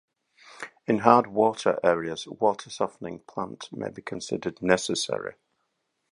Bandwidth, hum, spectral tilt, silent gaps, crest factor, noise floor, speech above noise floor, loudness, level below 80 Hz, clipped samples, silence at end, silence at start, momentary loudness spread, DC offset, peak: 11.5 kHz; none; -4.5 dB/octave; none; 26 dB; -77 dBFS; 51 dB; -26 LUFS; -64 dBFS; under 0.1%; 0.8 s; 0.5 s; 17 LU; under 0.1%; -2 dBFS